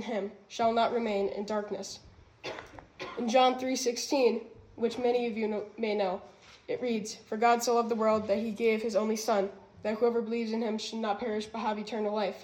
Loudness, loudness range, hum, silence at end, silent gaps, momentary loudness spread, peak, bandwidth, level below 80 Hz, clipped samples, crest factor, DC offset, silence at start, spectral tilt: -30 LUFS; 3 LU; none; 0 s; none; 13 LU; -12 dBFS; 16 kHz; -68 dBFS; under 0.1%; 18 dB; under 0.1%; 0 s; -4 dB/octave